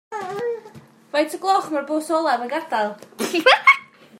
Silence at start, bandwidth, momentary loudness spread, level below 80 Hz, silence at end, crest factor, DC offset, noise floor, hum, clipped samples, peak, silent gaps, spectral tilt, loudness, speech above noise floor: 0.1 s; 16 kHz; 14 LU; -72 dBFS; 0.35 s; 20 dB; under 0.1%; -45 dBFS; none; under 0.1%; -2 dBFS; none; -2.5 dB/octave; -20 LUFS; 26 dB